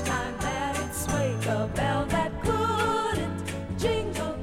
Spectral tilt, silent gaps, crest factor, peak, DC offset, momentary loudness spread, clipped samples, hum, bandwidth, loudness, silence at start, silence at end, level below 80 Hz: -5 dB/octave; none; 14 dB; -14 dBFS; under 0.1%; 5 LU; under 0.1%; none; 17 kHz; -28 LUFS; 0 s; 0 s; -42 dBFS